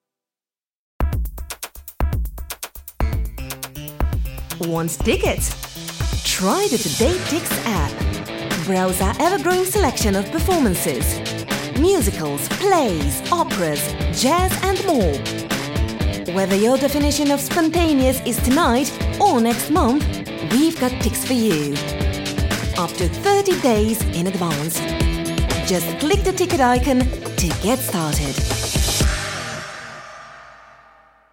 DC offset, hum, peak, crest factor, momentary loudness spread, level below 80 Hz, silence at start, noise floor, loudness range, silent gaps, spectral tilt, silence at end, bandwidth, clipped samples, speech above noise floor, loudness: under 0.1%; none; -4 dBFS; 16 dB; 10 LU; -28 dBFS; 1 s; under -90 dBFS; 6 LU; none; -4.5 dB/octave; 0.75 s; 17 kHz; under 0.1%; over 72 dB; -20 LUFS